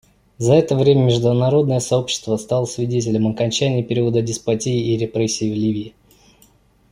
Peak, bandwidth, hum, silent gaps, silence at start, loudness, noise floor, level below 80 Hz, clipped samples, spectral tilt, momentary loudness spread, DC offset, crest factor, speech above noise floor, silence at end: -2 dBFS; 11.5 kHz; none; none; 0.4 s; -18 LUFS; -54 dBFS; -52 dBFS; under 0.1%; -6 dB/octave; 7 LU; under 0.1%; 16 dB; 37 dB; 1.05 s